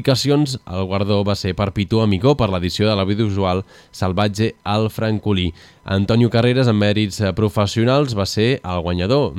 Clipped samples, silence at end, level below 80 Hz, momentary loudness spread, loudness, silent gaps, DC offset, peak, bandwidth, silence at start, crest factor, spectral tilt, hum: under 0.1%; 0 s; -42 dBFS; 7 LU; -18 LUFS; none; under 0.1%; -2 dBFS; 14.5 kHz; 0 s; 16 dB; -6.5 dB/octave; none